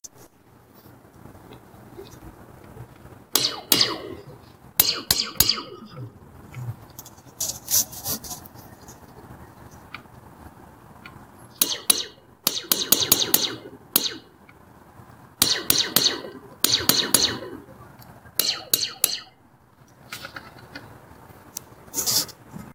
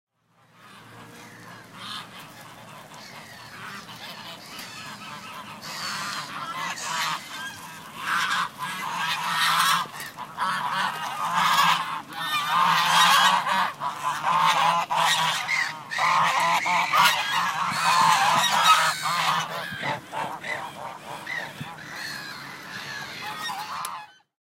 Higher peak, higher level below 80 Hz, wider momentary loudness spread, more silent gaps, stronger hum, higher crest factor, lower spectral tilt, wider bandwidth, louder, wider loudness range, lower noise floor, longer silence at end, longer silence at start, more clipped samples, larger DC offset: first, 0 dBFS vs -4 dBFS; first, -56 dBFS vs -72 dBFS; first, 24 LU vs 20 LU; neither; neither; first, 28 dB vs 22 dB; about the same, -1 dB/octave vs -1 dB/octave; about the same, 17.5 kHz vs 16 kHz; about the same, -21 LUFS vs -23 LUFS; second, 9 LU vs 18 LU; second, -55 dBFS vs -61 dBFS; second, 0 s vs 0.35 s; second, 0.05 s vs 0.65 s; neither; neither